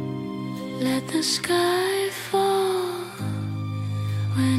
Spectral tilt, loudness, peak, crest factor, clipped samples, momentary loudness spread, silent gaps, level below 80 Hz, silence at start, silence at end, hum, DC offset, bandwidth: -5 dB/octave; -25 LUFS; -10 dBFS; 14 dB; under 0.1%; 9 LU; none; -62 dBFS; 0 s; 0 s; none; under 0.1%; 16 kHz